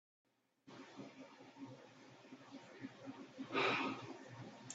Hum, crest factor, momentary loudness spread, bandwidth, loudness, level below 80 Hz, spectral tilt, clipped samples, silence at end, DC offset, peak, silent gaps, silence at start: none; 24 dB; 22 LU; 8 kHz; -44 LUFS; -88 dBFS; -2.5 dB/octave; under 0.1%; 0 s; under 0.1%; -24 dBFS; none; 0.65 s